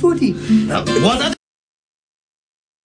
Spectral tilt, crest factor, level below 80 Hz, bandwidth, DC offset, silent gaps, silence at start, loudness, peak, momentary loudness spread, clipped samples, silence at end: -5.5 dB/octave; 16 dB; -44 dBFS; 10 kHz; under 0.1%; none; 0 s; -16 LUFS; -2 dBFS; 5 LU; under 0.1%; 1.5 s